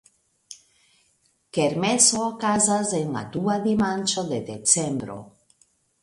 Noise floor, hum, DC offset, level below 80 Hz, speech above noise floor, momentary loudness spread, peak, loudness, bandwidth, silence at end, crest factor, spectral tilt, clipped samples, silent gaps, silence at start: -66 dBFS; none; under 0.1%; -60 dBFS; 43 dB; 12 LU; -4 dBFS; -22 LUFS; 11.5 kHz; 0.75 s; 22 dB; -3 dB/octave; under 0.1%; none; 0.5 s